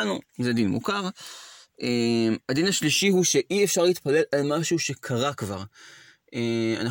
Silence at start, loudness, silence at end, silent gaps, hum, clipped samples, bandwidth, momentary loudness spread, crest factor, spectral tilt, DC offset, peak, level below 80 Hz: 0 s; -24 LUFS; 0 s; none; none; under 0.1%; 17 kHz; 13 LU; 16 dB; -4 dB/octave; under 0.1%; -8 dBFS; -66 dBFS